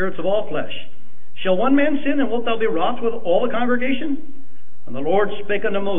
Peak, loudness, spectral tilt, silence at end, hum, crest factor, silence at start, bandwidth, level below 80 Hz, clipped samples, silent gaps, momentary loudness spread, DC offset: -6 dBFS; -21 LUFS; -9.5 dB/octave; 0 s; none; 14 dB; 0 s; 3.7 kHz; -68 dBFS; under 0.1%; none; 10 LU; 10%